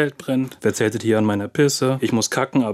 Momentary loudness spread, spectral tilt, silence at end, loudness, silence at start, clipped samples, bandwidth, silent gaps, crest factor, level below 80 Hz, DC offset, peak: 4 LU; -5 dB/octave; 0 s; -20 LUFS; 0 s; under 0.1%; 16 kHz; none; 16 dB; -64 dBFS; under 0.1%; -4 dBFS